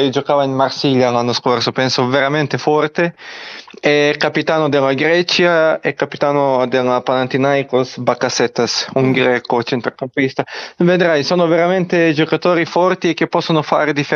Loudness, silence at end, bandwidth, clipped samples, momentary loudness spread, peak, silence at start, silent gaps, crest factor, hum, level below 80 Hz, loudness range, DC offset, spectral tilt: -15 LUFS; 0 s; 7.2 kHz; under 0.1%; 6 LU; 0 dBFS; 0 s; none; 14 dB; none; -62 dBFS; 2 LU; under 0.1%; -5 dB/octave